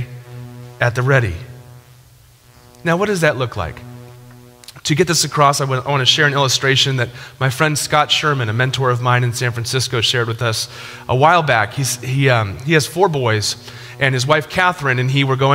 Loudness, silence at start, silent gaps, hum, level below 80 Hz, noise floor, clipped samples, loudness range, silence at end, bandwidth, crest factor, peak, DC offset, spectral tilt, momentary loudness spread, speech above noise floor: -16 LUFS; 0 s; none; none; -48 dBFS; -47 dBFS; under 0.1%; 6 LU; 0 s; 16.5 kHz; 18 dB; 0 dBFS; under 0.1%; -4 dB/octave; 13 LU; 31 dB